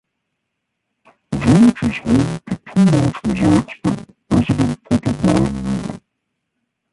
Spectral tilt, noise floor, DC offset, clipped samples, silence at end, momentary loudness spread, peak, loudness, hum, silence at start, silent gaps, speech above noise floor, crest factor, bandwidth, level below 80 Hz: -7 dB/octave; -75 dBFS; under 0.1%; under 0.1%; 0.95 s; 12 LU; -2 dBFS; -17 LUFS; none; 1.3 s; none; 60 dB; 16 dB; 11.5 kHz; -38 dBFS